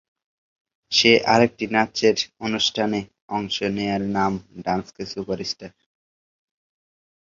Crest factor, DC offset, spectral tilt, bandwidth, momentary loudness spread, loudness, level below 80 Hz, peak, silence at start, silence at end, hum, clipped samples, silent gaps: 22 dB; under 0.1%; -4 dB/octave; 7.6 kHz; 14 LU; -21 LUFS; -56 dBFS; -2 dBFS; 0.9 s; 1.6 s; none; under 0.1%; 3.21-3.28 s